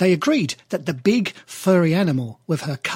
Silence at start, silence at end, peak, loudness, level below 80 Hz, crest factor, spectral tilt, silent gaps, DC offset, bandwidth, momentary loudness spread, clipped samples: 0 s; 0 s; -4 dBFS; -21 LUFS; -62 dBFS; 16 dB; -6 dB/octave; none; under 0.1%; 16.5 kHz; 9 LU; under 0.1%